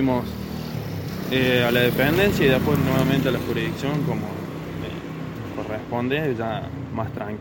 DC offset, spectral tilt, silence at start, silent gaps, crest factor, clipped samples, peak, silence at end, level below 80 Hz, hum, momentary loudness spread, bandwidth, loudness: under 0.1%; -6.5 dB/octave; 0 s; none; 18 dB; under 0.1%; -4 dBFS; 0 s; -44 dBFS; none; 13 LU; 17 kHz; -23 LUFS